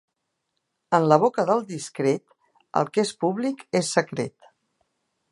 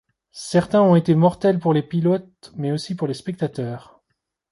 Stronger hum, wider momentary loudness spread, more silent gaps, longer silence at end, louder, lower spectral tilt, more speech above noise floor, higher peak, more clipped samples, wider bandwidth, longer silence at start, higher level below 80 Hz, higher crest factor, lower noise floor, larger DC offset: neither; second, 11 LU vs 15 LU; neither; first, 1.05 s vs 0.75 s; second, -24 LUFS vs -20 LUFS; second, -5 dB/octave vs -7.5 dB/octave; about the same, 55 dB vs 56 dB; about the same, -2 dBFS vs -4 dBFS; neither; about the same, 11.5 kHz vs 11.5 kHz; first, 0.9 s vs 0.35 s; second, -72 dBFS vs -56 dBFS; first, 22 dB vs 16 dB; about the same, -78 dBFS vs -76 dBFS; neither